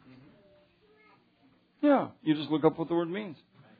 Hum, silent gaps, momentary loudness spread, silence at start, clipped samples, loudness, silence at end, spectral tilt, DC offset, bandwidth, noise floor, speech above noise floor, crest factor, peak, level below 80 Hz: none; none; 10 LU; 1.85 s; under 0.1%; -29 LUFS; 0.45 s; -10 dB/octave; under 0.1%; 4.9 kHz; -65 dBFS; 37 dB; 22 dB; -10 dBFS; -74 dBFS